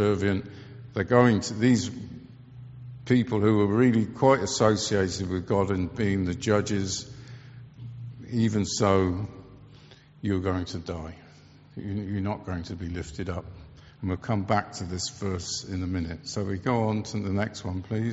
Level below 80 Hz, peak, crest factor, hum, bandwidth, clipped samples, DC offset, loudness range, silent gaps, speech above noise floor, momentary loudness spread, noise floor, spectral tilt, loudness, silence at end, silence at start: -52 dBFS; -4 dBFS; 22 dB; none; 8 kHz; under 0.1%; under 0.1%; 9 LU; none; 26 dB; 20 LU; -52 dBFS; -6 dB/octave; -27 LUFS; 0 s; 0 s